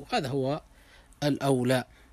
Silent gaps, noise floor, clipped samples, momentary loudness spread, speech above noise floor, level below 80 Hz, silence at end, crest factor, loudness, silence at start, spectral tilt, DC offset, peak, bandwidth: none; -55 dBFS; under 0.1%; 7 LU; 27 dB; -58 dBFS; 0.3 s; 18 dB; -29 LUFS; 0 s; -6 dB/octave; under 0.1%; -12 dBFS; 15.5 kHz